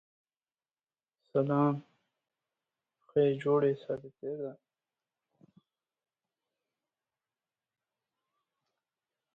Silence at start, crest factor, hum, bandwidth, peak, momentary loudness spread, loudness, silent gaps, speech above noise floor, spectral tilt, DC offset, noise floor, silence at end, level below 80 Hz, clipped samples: 1.35 s; 22 dB; none; 4.5 kHz; -16 dBFS; 13 LU; -32 LUFS; none; over 60 dB; -9.5 dB/octave; under 0.1%; under -90 dBFS; 4.8 s; -78 dBFS; under 0.1%